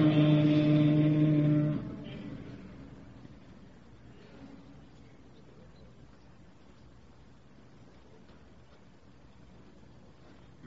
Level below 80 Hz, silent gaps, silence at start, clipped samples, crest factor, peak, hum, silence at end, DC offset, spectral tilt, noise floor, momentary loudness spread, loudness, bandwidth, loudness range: -60 dBFS; none; 0 s; under 0.1%; 18 dB; -14 dBFS; none; 6.2 s; 0.1%; -9.5 dB/octave; -58 dBFS; 28 LU; -27 LUFS; 5.6 kHz; 28 LU